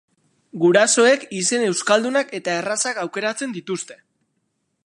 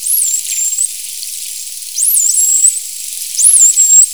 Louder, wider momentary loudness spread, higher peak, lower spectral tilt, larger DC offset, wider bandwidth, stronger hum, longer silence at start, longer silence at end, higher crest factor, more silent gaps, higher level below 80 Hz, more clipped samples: second, -19 LUFS vs -8 LUFS; about the same, 14 LU vs 16 LU; about the same, -2 dBFS vs 0 dBFS; first, -3 dB/octave vs 5.5 dB/octave; second, under 0.1% vs 0.7%; second, 11.5 kHz vs over 20 kHz; neither; first, 0.55 s vs 0 s; first, 0.9 s vs 0 s; first, 18 dB vs 12 dB; neither; second, -78 dBFS vs -56 dBFS; second, under 0.1% vs 0.3%